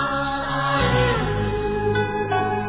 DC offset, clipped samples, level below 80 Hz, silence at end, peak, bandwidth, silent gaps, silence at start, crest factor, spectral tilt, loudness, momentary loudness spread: 0.2%; under 0.1%; -34 dBFS; 0 s; -8 dBFS; 4 kHz; none; 0 s; 14 dB; -10 dB/octave; -22 LUFS; 5 LU